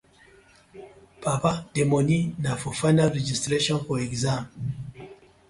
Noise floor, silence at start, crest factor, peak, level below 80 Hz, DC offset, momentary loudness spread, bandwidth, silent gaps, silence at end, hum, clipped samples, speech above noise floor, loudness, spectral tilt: -55 dBFS; 0.75 s; 18 dB; -8 dBFS; -52 dBFS; under 0.1%; 12 LU; 11.5 kHz; none; 0.35 s; none; under 0.1%; 31 dB; -25 LUFS; -5.5 dB/octave